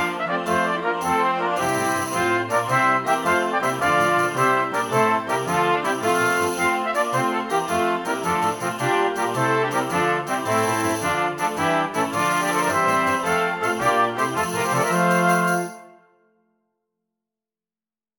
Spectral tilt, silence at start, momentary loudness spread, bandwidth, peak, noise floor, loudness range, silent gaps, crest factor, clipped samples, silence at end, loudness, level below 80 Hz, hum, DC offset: -4 dB/octave; 0 s; 4 LU; over 20 kHz; -6 dBFS; under -90 dBFS; 2 LU; none; 16 dB; under 0.1%; 2.3 s; -21 LUFS; -62 dBFS; none; under 0.1%